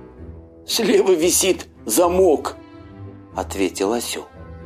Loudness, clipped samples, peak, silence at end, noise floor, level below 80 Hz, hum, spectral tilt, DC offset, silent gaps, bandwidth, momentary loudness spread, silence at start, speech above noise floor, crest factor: -19 LUFS; under 0.1%; -4 dBFS; 0 s; -39 dBFS; -44 dBFS; none; -3 dB/octave; under 0.1%; none; 15.5 kHz; 23 LU; 0 s; 21 dB; 18 dB